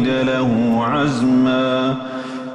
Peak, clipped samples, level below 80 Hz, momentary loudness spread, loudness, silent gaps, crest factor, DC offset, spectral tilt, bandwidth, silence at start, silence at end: -8 dBFS; under 0.1%; -50 dBFS; 9 LU; -17 LUFS; none; 10 dB; under 0.1%; -6.5 dB/octave; 9.4 kHz; 0 s; 0 s